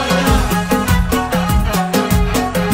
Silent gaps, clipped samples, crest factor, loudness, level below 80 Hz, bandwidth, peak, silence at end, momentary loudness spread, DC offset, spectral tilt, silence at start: none; under 0.1%; 14 dB; -15 LUFS; -20 dBFS; 16.5 kHz; 0 dBFS; 0 s; 2 LU; under 0.1%; -5 dB/octave; 0 s